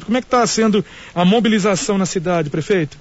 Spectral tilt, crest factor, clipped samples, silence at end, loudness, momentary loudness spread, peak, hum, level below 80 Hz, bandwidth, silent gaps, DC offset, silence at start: -5 dB/octave; 12 dB; under 0.1%; 0.05 s; -17 LUFS; 5 LU; -4 dBFS; none; -48 dBFS; 8 kHz; none; under 0.1%; 0 s